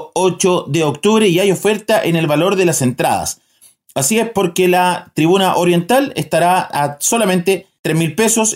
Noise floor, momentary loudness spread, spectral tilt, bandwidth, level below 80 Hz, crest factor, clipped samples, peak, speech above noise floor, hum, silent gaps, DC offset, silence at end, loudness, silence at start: -49 dBFS; 5 LU; -4 dB/octave; 16.5 kHz; -56 dBFS; 12 dB; under 0.1%; -2 dBFS; 35 dB; none; 7.79-7.84 s; under 0.1%; 0 s; -14 LUFS; 0 s